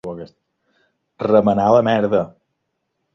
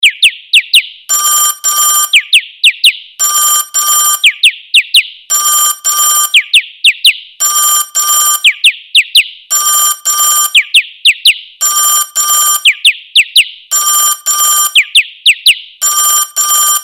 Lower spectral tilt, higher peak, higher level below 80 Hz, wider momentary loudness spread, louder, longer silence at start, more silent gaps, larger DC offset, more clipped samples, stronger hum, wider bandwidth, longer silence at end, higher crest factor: first, -8 dB/octave vs 6.5 dB/octave; about the same, -2 dBFS vs 0 dBFS; first, -54 dBFS vs -64 dBFS; first, 17 LU vs 4 LU; second, -16 LUFS vs -7 LUFS; about the same, 0.05 s vs 0 s; neither; neither; second, under 0.1% vs 0.5%; neither; second, 6.6 kHz vs over 20 kHz; first, 0.85 s vs 0 s; first, 18 dB vs 10 dB